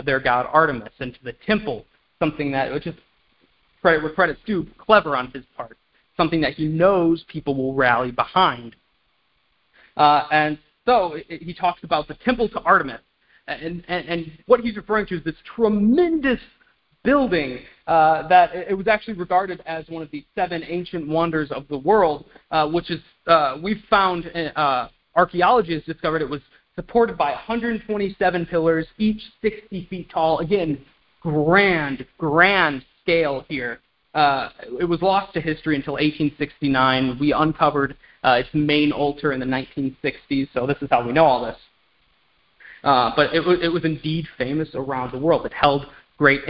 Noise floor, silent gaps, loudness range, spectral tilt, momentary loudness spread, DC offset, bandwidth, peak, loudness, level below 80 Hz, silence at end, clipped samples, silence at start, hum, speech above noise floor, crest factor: -66 dBFS; none; 3 LU; -10.5 dB/octave; 13 LU; under 0.1%; 5.6 kHz; 0 dBFS; -21 LUFS; -48 dBFS; 0 s; under 0.1%; 0 s; none; 46 dB; 20 dB